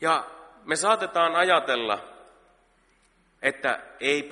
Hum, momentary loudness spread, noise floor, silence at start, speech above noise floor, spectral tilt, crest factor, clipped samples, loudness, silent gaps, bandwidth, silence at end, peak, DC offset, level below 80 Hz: none; 9 LU; -64 dBFS; 0 s; 39 dB; -2 dB/octave; 22 dB; under 0.1%; -24 LUFS; none; 11.5 kHz; 0 s; -6 dBFS; under 0.1%; -70 dBFS